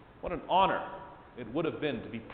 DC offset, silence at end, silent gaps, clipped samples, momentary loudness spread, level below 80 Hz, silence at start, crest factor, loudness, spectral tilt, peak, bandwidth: under 0.1%; 0 s; none; under 0.1%; 19 LU; -56 dBFS; 0 s; 20 dB; -32 LUFS; -9 dB/octave; -14 dBFS; 4.6 kHz